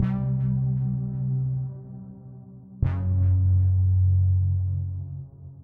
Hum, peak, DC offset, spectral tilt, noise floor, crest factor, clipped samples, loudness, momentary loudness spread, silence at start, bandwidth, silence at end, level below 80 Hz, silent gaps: none; -10 dBFS; under 0.1%; -12.5 dB/octave; -44 dBFS; 14 dB; under 0.1%; -25 LUFS; 21 LU; 0 s; 2.2 kHz; 0 s; -44 dBFS; none